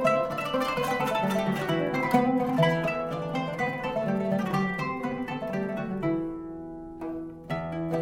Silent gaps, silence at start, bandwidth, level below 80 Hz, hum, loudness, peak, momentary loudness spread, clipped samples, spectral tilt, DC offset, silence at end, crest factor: none; 0 s; 17 kHz; -54 dBFS; none; -28 LUFS; -10 dBFS; 12 LU; under 0.1%; -6.5 dB/octave; under 0.1%; 0 s; 18 dB